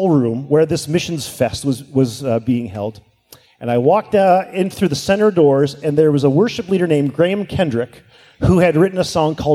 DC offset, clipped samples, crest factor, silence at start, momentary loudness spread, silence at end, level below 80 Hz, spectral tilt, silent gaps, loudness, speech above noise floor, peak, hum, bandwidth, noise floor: under 0.1%; under 0.1%; 14 dB; 0 s; 8 LU; 0 s; -42 dBFS; -6.5 dB/octave; none; -16 LUFS; 32 dB; -2 dBFS; none; 15.5 kHz; -48 dBFS